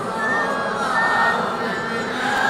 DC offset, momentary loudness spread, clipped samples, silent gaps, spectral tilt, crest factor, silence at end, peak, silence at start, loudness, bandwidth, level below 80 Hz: under 0.1%; 6 LU; under 0.1%; none; -4 dB/octave; 14 dB; 0 s; -6 dBFS; 0 s; -20 LUFS; 16 kHz; -56 dBFS